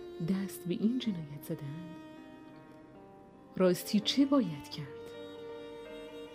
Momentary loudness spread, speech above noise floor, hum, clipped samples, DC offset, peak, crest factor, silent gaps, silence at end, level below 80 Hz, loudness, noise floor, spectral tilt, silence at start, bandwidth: 24 LU; 22 dB; none; under 0.1%; under 0.1%; -18 dBFS; 18 dB; none; 0 s; -70 dBFS; -33 LUFS; -55 dBFS; -6 dB/octave; 0 s; 15.5 kHz